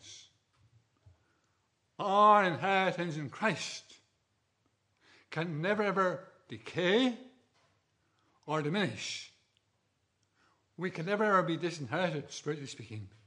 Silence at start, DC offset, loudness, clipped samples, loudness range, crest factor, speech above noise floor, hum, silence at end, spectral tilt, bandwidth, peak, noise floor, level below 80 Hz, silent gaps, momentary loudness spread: 0.05 s; under 0.1%; -31 LUFS; under 0.1%; 8 LU; 22 dB; 46 dB; none; 0.2 s; -5 dB/octave; 11 kHz; -12 dBFS; -78 dBFS; -86 dBFS; none; 19 LU